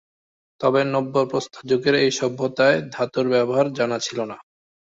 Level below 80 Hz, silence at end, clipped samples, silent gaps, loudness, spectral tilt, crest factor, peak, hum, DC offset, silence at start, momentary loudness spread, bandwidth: -64 dBFS; 0.55 s; under 0.1%; none; -21 LUFS; -4.5 dB/octave; 18 dB; -4 dBFS; none; under 0.1%; 0.6 s; 8 LU; 8 kHz